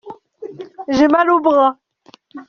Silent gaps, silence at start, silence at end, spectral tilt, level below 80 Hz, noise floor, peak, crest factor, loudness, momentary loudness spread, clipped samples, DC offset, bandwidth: none; 0.05 s; 0.05 s; -3 dB/octave; -54 dBFS; -50 dBFS; 0 dBFS; 16 dB; -14 LUFS; 21 LU; under 0.1%; under 0.1%; 6.8 kHz